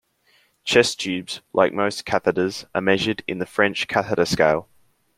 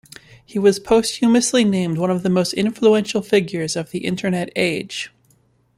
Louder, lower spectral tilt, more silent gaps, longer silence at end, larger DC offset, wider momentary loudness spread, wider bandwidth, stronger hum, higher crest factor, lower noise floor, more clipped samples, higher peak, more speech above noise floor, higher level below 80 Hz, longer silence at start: about the same, -21 LUFS vs -19 LUFS; about the same, -4 dB/octave vs -5 dB/octave; neither; second, 0.55 s vs 0.7 s; neither; about the same, 8 LU vs 9 LU; about the same, 15.5 kHz vs 15.5 kHz; neither; about the same, 20 dB vs 16 dB; about the same, -61 dBFS vs -59 dBFS; neither; about the same, -2 dBFS vs -4 dBFS; about the same, 40 dB vs 41 dB; about the same, -56 dBFS vs -54 dBFS; first, 0.65 s vs 0.5 s